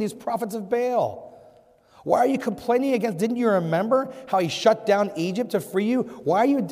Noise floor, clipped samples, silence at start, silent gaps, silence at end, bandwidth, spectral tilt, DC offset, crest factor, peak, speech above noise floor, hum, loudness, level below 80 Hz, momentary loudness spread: -55 dBFS; under 0.1%; 0 s; none; 0 s; 16 kHz; -6 dB/octave; under 0.1%; 18 dB; -6 dBFS; 32 dB; none; -23 LUFS; -68 dBFS; 7 LU